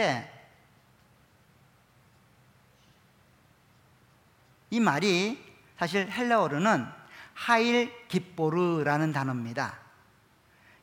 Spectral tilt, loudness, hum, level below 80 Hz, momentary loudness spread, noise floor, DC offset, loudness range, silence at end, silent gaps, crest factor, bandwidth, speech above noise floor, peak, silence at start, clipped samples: -5.5 dB/octave; -28 LUFS; none; -72 dBFS; 14 LU; -62 dBFS; under 0.1%; 5 LU; 1.05 s; none; 22 dB; 16.5 kHz; 35 dB; -8 dBFS; 0 s; under 0.1%